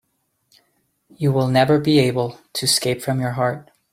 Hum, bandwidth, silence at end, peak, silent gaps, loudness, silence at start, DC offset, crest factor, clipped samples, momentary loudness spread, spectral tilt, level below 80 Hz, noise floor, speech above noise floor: none; 16 kHz; 0.3 s; -2 dBFS; none; -19 LUFS; 1.2 s; under 0.1%; 18 dB; under 0.1%; 9 LU; -5 dB/octave; -58 dBFS; -70 dBFS; 51 dB